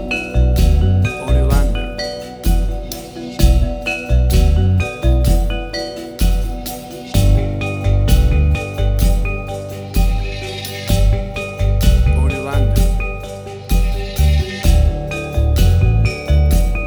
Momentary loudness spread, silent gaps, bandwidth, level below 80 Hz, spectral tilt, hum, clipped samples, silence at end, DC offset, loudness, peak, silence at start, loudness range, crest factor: 10 LU; none; over 20 kHz; -16 dBFS; -6 dB/octave; none; under 0.1%; 0 s; under 0.1%; -17 LUFS; -2 dBFS; 0 s; 2 LU; 14 dB